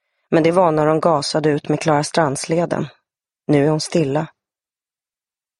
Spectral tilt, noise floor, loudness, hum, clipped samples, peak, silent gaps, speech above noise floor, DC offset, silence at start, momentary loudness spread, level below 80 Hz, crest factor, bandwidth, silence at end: -5.5 dB/octave; under -90 dBFS; -18 LUFS; none; under 0.1%; -2 dBFS; none; over 73 dB; under 0.1%; 0.3 s; 9 LU; -56 dBFS; 18 dB; 11.5 kHz; 1.35 s